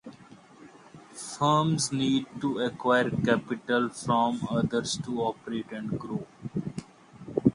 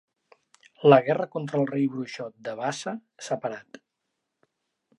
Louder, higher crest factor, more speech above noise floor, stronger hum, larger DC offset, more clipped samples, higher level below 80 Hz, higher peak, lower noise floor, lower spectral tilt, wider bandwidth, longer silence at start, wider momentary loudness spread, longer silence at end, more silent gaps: about the same, -28 LUFS vs -26 LUFS; about the same, 22 dB vs 24 dB; second, 24 dB vs 56 dB; neither; neither; neither; first, -60 dBFS vs -80 dBFS; second, -6 dBFS vs -2 dBFS; second, -52 dBFS vs -81 dBFS; about the same, -5 dB/octave vs -6 dB/octave; about the same, 11.5 kHz vs 11.5 kHz; second, 0.05 s vs 0.8 s; second, 14 LU vs 17 LU; second, 0 s vs 1.35 s; neither